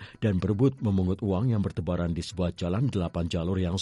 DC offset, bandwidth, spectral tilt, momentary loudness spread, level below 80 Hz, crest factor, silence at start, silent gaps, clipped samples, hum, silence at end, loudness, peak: under 0.1%; 11.5 kHz; -7.5 dB/octave; 5 LU; -46 dBFS; 14 dB; 0 s; none; under 0.1%; none; 0 s; -28 LUFS; -12 dBFS